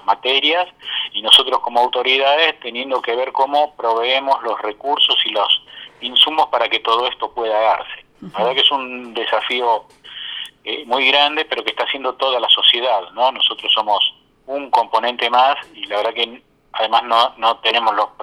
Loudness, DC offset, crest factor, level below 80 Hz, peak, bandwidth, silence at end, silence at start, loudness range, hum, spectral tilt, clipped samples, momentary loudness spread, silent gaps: -16 LUFS; under 0.1%; 18 dB; -62 dBFS; 0 dBFS; 17.5 kHz; 0 s; 0.05 s; 3 LU; none; -1.5 dB/octave; under 0.1%; 12 LU; none